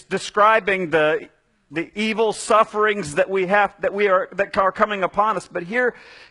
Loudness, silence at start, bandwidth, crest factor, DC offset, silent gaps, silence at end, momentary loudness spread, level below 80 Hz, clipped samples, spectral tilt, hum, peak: -20 LUFS; 0.1 s; 11 kHz; 18 dB; under 0.1%; none; 0.15 s; 8 LU; -56 dBFS; under 0.1%; -4 dB/octave; none; -2 dBFS